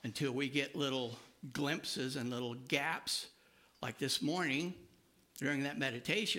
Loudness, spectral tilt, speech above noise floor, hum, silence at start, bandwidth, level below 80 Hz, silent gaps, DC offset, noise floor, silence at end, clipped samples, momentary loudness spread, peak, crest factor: -37 LUFS; -4 dB/octave; 31 dB; none; 0.05 s; 16.5 kHz; -76 dBFS; none; under 0.1%; -68 dBFS; 0 s; under 0.1%; 11 LU; -18 dBFS; 22 dB